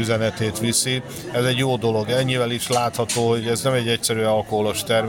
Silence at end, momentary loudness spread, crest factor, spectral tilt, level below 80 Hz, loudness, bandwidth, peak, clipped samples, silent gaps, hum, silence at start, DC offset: 0 s; 3 LU; 14 dB; -4 dB/octave; -52 dBFS; -21 LUFS; 17 kHz; -6 dBFS; under 0.1%; none; none; 0 s; under 0.1%